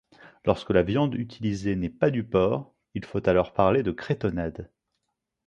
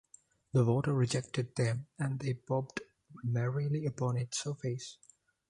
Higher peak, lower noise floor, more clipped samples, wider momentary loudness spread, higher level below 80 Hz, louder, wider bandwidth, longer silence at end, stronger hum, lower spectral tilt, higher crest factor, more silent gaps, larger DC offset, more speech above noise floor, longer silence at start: first, -4 dBFS vs -16 dBFS; first, -81 dBFS vs -62 dBFS; neither; about the same, 10 LU vs 11 LU; first, -48 dBFS vs -66 dBFS; first, -26 LUFS vs -34 LUFS; second, 9.2 kHz vs 11 kHz; first, 0.8 s vs 0.55 s; neither; first, -8 dB/octave vs -6 dB/octave; about the same, 22 dB vs 18 dB; neither; neither; first, 56 dB vs 29 dB; second, 0.25 s vs 0.55 s